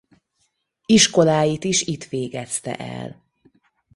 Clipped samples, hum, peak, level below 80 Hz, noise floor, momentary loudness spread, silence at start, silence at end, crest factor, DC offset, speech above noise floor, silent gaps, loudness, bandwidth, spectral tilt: under 0.1%; none; -2 dBFS; -56 dBFS; -70 dBFS; 19 LU; 0.9 s; 0.85 s; 20 dB; under 0.1%; 50 dB; none; -19 LUFS; 11.5 kHz; -3.5 dB/octave